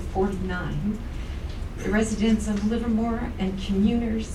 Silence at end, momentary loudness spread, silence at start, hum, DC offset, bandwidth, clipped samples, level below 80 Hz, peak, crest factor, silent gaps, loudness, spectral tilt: 0 s; 11 LU; 0 s; none; under 0.1%; 12 kHz; under 0.1%; -34 dBFS; -10 dBFS; 14 dB; none; -26 LUFS; -6.5 dB/octave